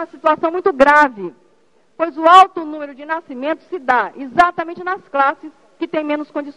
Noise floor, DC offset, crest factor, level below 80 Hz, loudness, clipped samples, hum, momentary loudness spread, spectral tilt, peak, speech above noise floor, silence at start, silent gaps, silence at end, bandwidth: -58 dBFS; 0.2%; 16 dB; -54 dBFS; -15 LUFS; 0.2%; none; 18 LU; -4 dB/octave; 0 dBFS; 42 dB; 0 s; none; 0.05 s; 11 kHz